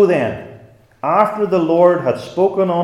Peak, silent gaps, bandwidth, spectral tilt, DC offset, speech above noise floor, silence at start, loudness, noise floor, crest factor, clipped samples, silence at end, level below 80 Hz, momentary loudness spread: 0 dBFS; none; 11.5 kHz; -8 dB/octave; under 0.1%; 28 dB; 0 s; -16 LUFS; -43 dBFS; 16 dB; under 0.1%; 0 s; -58 dBFS; 10 LU